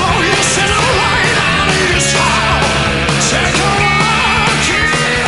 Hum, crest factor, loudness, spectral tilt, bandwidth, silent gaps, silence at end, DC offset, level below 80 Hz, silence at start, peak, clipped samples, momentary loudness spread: none; 12 dB; -11 LUFS; -3 dB/octave; 11.5 kHz; none; 0 s; 1%; -28 dBFS; 0 s; 0 dBFS; under 0.1%; 1 LU